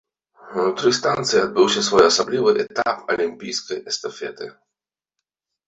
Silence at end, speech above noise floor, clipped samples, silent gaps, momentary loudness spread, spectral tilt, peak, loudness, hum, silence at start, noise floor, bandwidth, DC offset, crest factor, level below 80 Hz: 1.2 s; 67 dB; under 0.1%; none; 15 LU; -3 dB/octave; -2 dBFS; -19 LUFS; none; 0.45 s; -86 dBFS; 8.2 kHz; under 0.1%; 20 dB; -58 dBFS